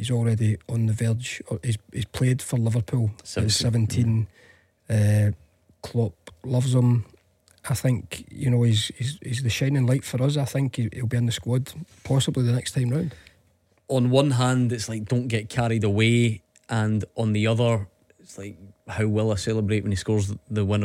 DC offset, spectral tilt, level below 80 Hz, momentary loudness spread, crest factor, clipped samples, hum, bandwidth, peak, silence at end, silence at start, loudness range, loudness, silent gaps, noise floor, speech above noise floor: under 0.1%; -6 dB/octave; -52 dBFS; 10 LU; 18 dB; under 0.1%; none; 14.5 kHz; -6 dBFS; 0 s; 0 s; 2 LU; -24 LUFS; none; -64 dBFS; 41 dB